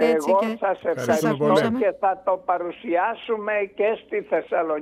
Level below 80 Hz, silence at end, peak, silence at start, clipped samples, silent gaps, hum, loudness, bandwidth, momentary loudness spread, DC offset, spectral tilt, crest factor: -66 dBFS; 0 s; -6 dBFS; 0 s; under 0.1%; none; none; -23 LUFS; 15.5 kHz; 6 LU; under 0.1%; -5.5 dB/octave; 16 dB